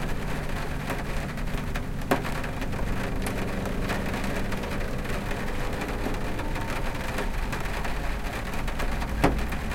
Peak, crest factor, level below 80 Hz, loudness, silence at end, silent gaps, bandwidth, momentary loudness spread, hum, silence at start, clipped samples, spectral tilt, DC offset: -8 dBFS; 20 dB; -32 dBFS; -31 LUFS; 0 s; none; 17 kHz; 5 LU; none; 0 s; under 0.1%; -5.5 dB/octave; under 0.1%